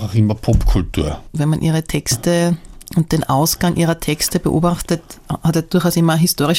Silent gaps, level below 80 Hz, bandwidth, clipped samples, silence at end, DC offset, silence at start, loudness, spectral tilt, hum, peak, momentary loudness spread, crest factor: none; -28 dBFS; 17 kHz; under 0.1%; 0 s; under 0.1%; 0 s; -17 LUFS; -5.5 dB/octave; none; -2 dBFS; 7 LU; 14 dB